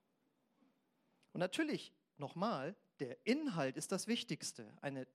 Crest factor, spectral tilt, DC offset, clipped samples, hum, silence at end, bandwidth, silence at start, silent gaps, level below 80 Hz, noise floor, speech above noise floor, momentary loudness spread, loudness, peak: 20 dB; -4.5 dB/octave; under 0.1%; under 0.1%; none; 0.1 s; 15.5 kHz; 1.35 s; none; under -90 dBFS; -81 dBFS; 40 dB; 11 LU; -42 LUFS; -22 dBFS